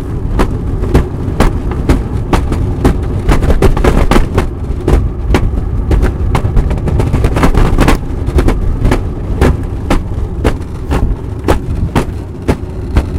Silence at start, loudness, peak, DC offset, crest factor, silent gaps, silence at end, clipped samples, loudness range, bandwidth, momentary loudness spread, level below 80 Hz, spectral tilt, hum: 0 s; -14 LUFS; 0 dBFS; under 0.1%; 10 dB; none; 0 s; 0.7%; 3 LU; 15 kHz; 6 LU; -14 dBFS; -7 dB/octave; none